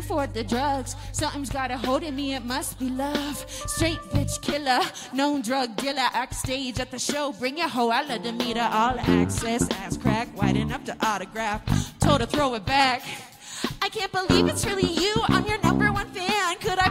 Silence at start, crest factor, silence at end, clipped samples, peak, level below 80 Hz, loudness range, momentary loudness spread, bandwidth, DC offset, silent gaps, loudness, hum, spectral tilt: 0 s; 18 dB; 0 s; under 0.1%; -8 dBFS; -42 dBFS; 4 LU; 8 LU; 16 kHz; under 0.1%; none; -25 LUFS; none; -4.5 dB/octave